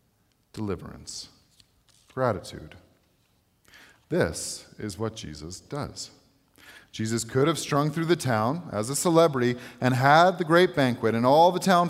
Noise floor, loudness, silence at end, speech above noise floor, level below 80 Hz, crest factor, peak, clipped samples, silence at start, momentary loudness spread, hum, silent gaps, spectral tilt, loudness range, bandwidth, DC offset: -68 dBFS; -24 LUFS; 0 s; 43 dB; -58 dBFS; 22 dB; -4 dBFS; under 0.1%; 0.55 s; 20 LU; none; none; -5 dB/octave; 13 LU; 16 kHz; under 0.1%